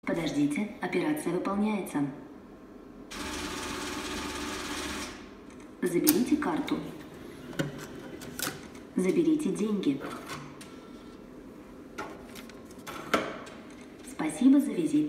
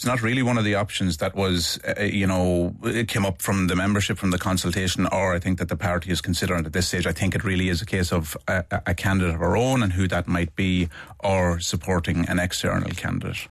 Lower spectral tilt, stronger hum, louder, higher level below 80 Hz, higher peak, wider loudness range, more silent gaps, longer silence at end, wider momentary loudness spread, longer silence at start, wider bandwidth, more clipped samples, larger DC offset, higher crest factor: about the same, -4.5 dB/octave vs -5 dB/octave; neither; second, -30 LUFS vs -23 LUFS; second, -56 dBFS vs -42 dBFS; first, -4 dBFS vs -8 dBFS; first, 7 LU vs 1 LU; neither; about the same, 0 s vs 0.05 s; first, 21 LU vs 4 LU; about the same, 0.05 s vs 0 s; first, 16 kHz vs 14 kHz; neither; neither; first, 28 dB vs 14 dB